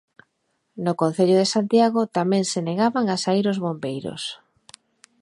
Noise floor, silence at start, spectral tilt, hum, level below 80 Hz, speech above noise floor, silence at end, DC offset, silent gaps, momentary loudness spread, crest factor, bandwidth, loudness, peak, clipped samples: -72 dBFS; 0.75 s; -5.5 dB/octave; none; -70 dBFS; 51 dB; 0.85 s; under 0.1%; none; 11 LU; 16 dB; 11.5 kHz; -22 LUFS; -6 dBFS; under 0.1%